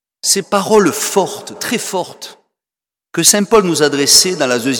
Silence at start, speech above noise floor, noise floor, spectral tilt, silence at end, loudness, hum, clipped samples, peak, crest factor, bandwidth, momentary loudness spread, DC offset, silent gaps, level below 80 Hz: 0.25 s; 75 dB; -89 dBFS; -2.5 dB/octave; 0 s; -12 LUFS; none; under 0.1%; 0 dBFS; 14 dB; 19.5 kHz; 15 LU; under 0.1%; none; -52 dBFS